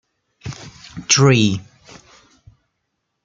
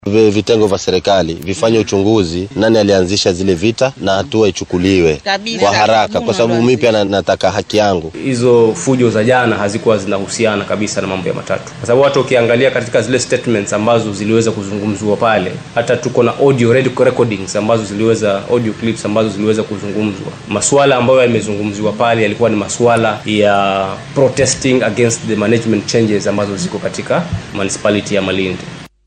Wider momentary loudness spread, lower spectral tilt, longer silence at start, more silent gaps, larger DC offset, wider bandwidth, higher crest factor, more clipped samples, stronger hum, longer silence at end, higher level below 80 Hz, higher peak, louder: first, 24 LU vs 7 LU; about the same, -4 dB/octave vs -5 dB/octave; first, 0.45 s vs 0.05 s; neither; neither; second, 9.4 kHz vs 10.5 kHz; first, 20 dB vs 12 dB; neither; neither; first, 1.65 s vs 0.2 s; second, -54 dBFS vs -44 dBFS; about the same, -2 dBFS vs 0 dBFS; about the same, -15 LUFS vs -13 LUFS